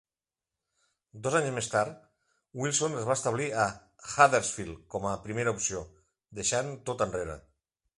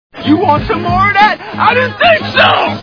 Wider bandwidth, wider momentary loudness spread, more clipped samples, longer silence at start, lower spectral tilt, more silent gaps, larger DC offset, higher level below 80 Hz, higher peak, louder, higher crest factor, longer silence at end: first, 11.5 kHz vs 5.4 kHz; first, 16 LU vs 5 LU; second, under 0.1% vs 0.6%; first, 1.15 s vs 0.15 s; second, -3.5 dB/octave vs -6.5 dB/octave; neither; neither; second, -58 dBFS vs -34 dBFS; second, -6 dBFS vs 0 dBFS; second, -30 LUFS vs -10 LUFS; first, 26 dB vs 10 dB; first, 0.6 s vs 0 s